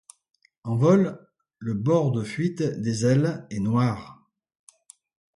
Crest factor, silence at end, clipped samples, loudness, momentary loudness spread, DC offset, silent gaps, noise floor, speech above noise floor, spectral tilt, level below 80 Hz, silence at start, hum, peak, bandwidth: 20 dB; 1.2 s; under 0.1%; -24 LUFS; 14 LU; under 0.1%; none; -55 dBFS; 32 dB; -7.5 dB/octave; -60 dBFS; 0.65 s; none; -6 dBFS; 11.5 kHz